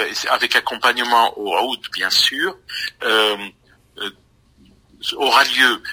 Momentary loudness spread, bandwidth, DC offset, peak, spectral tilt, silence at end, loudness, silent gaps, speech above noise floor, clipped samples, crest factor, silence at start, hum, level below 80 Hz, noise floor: 14 LU; 16 kHz; under 0.1%; 0 dBFS; -0.5 dB/octave; 0 s; -17 LUFS; none; 34 dB; under 0.1%; 20 dB; 0 s; none; -60 dBFS; -53 dBFS